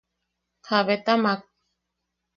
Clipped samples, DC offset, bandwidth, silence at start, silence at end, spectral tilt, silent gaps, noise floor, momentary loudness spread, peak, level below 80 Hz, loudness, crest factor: under 0.1%; under 0.1%; 6.8 kHz; 0.65 s; 0.95 s; -6 dB/octave; none; -81 dBFS; 5 LU; -6 dBFS; -74 dBFS; -23 LUFS; 20 dB